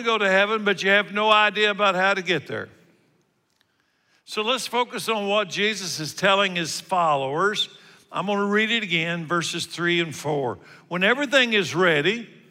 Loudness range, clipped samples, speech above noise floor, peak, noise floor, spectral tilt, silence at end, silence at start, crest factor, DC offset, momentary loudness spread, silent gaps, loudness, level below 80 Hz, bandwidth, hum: 5 LU; under 0.1%; 45 dB; -6 dBFS; -68 dBFS; -3.5 dB/octave; 0.25 s; 0 s; 18 dB; under 0.1%; 10 LU; none; -22 LUFS; -76 dBFS; 16 kHz; none